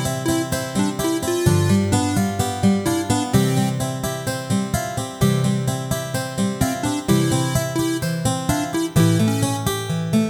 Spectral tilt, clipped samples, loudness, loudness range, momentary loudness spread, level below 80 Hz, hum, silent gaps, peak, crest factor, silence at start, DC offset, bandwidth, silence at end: -5.5 dB/octave; under 0.1%; -21 LUFS; 2 LU; 6 LU; -42 dBFS; none; none; -4 dBFS; 16 dB; 0 s; under 0.1%; 19.5 kHz; 0 s